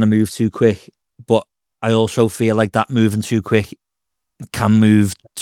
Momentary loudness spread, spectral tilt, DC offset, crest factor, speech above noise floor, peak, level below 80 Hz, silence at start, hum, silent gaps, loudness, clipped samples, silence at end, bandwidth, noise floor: 8 LU; -6.5 dB/octave; under 0.1%; 16 dB; 66 dB; 0 dBFS; -54 dBFS; 0 s; none; none; -17 LUFS; under 0.1%; 0 s; 15 kHz; -82 dBFS